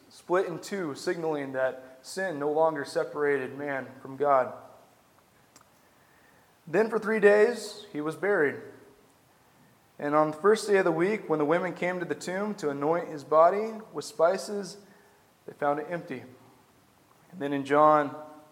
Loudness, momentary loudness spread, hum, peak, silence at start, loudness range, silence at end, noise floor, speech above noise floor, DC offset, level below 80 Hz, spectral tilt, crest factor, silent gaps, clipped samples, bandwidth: -27 LUFS; 15 LU; none; -8 dBFS; 0.15 s; 5 LU; 0.1 s; -61 dBFS; 34 dB; under 0.1%; -80 dBFS; -5.5 dB/octave; 20 dB; none; under 0.1%; 16 kHz